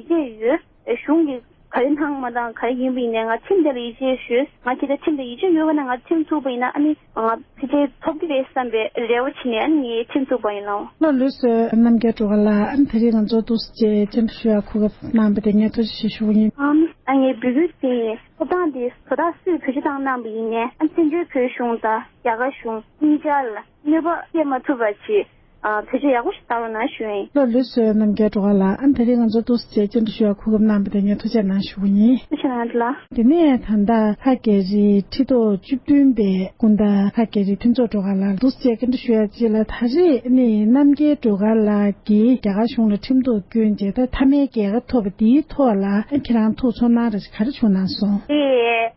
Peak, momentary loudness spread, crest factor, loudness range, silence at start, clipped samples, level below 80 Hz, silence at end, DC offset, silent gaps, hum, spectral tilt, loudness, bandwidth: -4 dBFS; 7 LU; 14 dB; 4 LU; 0.1 s; under 0.1%; -46 dBFS; 0.05 s; under 0.1%; none; none; -12 dB/octave; -19 LUFS; 5.8 kHz